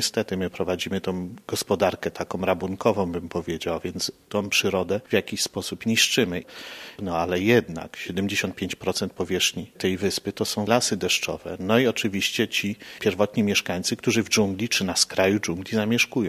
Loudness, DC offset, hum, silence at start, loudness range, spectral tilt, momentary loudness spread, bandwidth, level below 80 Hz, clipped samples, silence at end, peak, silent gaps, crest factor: -24 LUFS; under 0.1%; none; 0 s; 3 LU; -3.5 dB/octave; 9 LU; 15.5 kHz; -50 dBFS; under 0.1%; 0 s; -4 dBFS; none; 22 dB